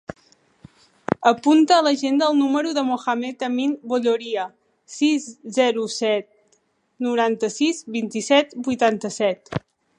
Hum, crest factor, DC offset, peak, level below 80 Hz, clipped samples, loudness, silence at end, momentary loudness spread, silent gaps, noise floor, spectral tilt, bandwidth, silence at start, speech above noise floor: none; 20 dB; under 0.1%; 0 dBFS; -64 dBFS; under 0.1%; -21 LUFS; 0.4 s; 11 LU; none; -65 dBFS; -4 dB/octave; 10.5 kHz; 0.1 s; 44 dB